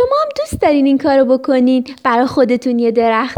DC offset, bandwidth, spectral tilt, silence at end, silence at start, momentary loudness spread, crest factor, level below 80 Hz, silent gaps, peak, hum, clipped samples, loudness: under 0.1%; 12 kHz; -6 dB/octave; 0 s; 0 s; 4 LU; 12 dB; -44 dBFS; none; 0 dBFS; none; under 0.1%; -13 LUFS